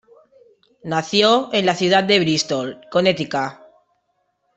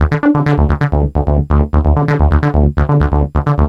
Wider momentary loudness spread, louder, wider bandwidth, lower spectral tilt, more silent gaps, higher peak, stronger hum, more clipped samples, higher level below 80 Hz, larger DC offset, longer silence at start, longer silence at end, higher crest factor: first, 10 LU vs 3 LU; second, -18 LUFS vs -13 LUFS; first, 8.4 kHz vs 5.4 kHz; second, -4 dB/octave vs -10 dB/octave; neither; about the same, -2 dBFS vs -2 dBFS; neither; neither; second, -62 dBFS vs -16 dBFS; second, under 0.1% vs 0.1%; first, 0.85 s vs 0 s; first, 1.05 s vs 0 s; first, 18 dB vs 10 dB